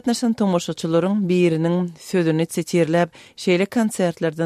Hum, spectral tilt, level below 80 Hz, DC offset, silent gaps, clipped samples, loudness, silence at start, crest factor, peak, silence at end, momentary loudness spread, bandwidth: none; -6 dB/octave; -64 dBFS; under 0.1%; none; under 0.1%; -20 LUFS; 0.05 s; 14 dB; -6 dBFS; 0 s; 5 LU; 15 kHz